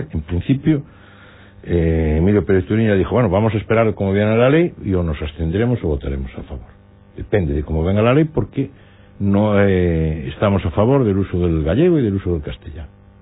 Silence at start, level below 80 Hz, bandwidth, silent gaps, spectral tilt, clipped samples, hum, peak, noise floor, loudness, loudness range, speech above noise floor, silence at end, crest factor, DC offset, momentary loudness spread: 0 s; -32 dBFS; 4 kHz; none; -12.5 dB/octave; under 0.1%; none; -4 dBFS; -43 dBFS; -17 LUFS; 4 LU; 26 dB; 0.35 s; 14 dB; under 0.1%; 12 LU